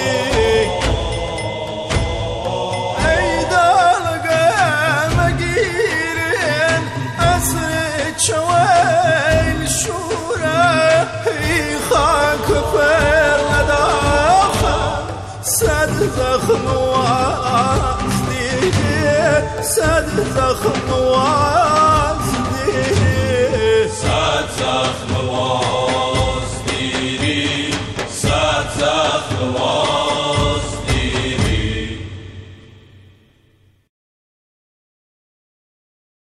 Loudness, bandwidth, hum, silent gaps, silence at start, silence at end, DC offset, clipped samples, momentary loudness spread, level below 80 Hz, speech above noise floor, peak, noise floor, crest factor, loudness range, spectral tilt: -16 LUFS; 15 kHz; none; none; 0 s; 3.7 s; under 0.1%; under 0.1%; 8 LU; -30 dBFS; 39 dB; -2 dBFS; -54 dBFS; 14 dB; 4 LU; -4 dB/octave